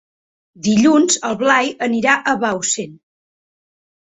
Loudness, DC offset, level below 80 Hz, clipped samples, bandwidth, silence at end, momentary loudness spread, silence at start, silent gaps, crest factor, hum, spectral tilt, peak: -16 LUFS; under 0.1%; -60 dBFS; under 0.1%; 8.4 kHz; 1.1 s; 9 LU; 0.6 s; none; 18 dB; none; -3 dB/octave; 0 dBFS